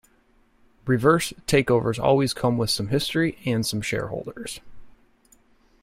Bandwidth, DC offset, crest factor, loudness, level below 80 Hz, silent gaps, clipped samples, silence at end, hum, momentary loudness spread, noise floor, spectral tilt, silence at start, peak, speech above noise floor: 16 kHz; under 0.1%; 20 dB; -23 LUFS; -50 dBFS; none; under 0.1%; 0.95 s; none; 14 LU; -60 dBFS; -5 dB/octave; 0.85 s; -4 dBFS; 38 dB